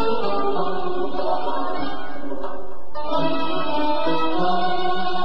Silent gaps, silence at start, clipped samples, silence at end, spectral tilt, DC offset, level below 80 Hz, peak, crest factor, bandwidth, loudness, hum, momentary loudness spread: none; 0 s; under 0.1%; 0 s; -6.5 dB/octave; 10%; -50 dBFS; -6 dBFS; 14 dB; 12 kHz; -24 LUFS; none; 11 LU